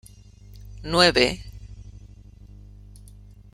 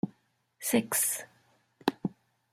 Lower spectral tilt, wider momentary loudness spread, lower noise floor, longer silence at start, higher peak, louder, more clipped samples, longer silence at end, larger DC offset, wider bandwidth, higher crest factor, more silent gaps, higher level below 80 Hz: about the same, -3.5 dB/octave vs -3 dB/octave; first, 28 LU vs 12 LU; second, -47 dBFS vs -70 dBFS; first, 0.6 s vs 0.05 s; first, -2 dBFS vs -8 dBFS; first, -19 LUFS vs -31 LUFS; neither; first, 1.65 s vs 0.4 s; neither; about the same, 16.5 kHz vs 16 kHz; about the same, 26 dB vs 26 dB; neither; first, -44 dBFS vs -74 dBFS